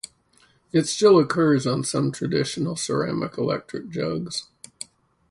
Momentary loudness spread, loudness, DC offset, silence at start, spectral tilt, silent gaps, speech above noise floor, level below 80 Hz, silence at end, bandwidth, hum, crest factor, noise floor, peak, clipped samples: 19 LU; -23 LUFS; under 0.1%; 0.05 s; -5 dB/octave; none; 38 dB; -60 dBFS; 0.85 s; 11.5 kHz; none; 18 dB; -60 dBFS; -6 dBFS; under 0.1%